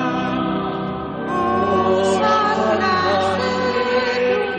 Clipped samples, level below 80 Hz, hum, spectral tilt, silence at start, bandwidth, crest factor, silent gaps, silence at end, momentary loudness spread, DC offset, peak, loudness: under 0.1%; -50 dBFS; none; -5.5 dB/octave; 0 s; 9.6 kHz; 12 dB; none; 0 s; 7 LU; under 0.1%; -6 dBFS; -19 LUFS